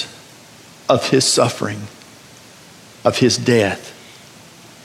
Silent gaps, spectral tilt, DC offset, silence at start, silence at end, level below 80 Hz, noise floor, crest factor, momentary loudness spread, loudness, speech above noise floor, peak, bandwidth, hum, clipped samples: none; -4 dB/octave; under 0.1%; 0 s; 0.9 s; -60 dBFS; -43 dBFS; 18 dB; 19 LU; -17 LUFS; 27 dB; -2 dBFS; 16 kHz; none; under 0.1%